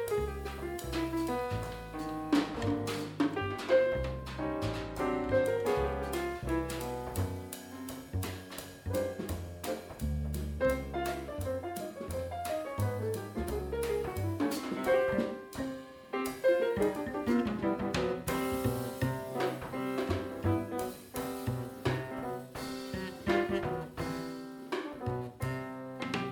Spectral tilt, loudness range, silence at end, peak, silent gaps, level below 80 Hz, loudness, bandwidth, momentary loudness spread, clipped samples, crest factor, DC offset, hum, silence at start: -6 dB/octave; 4 LU; 0 s; -16 dBFS; none; -48 dBFS; -35 LUFS; over 20 kHz; 10 LU; under 0.1%; 18 dB; under 0.1%; none; 0 s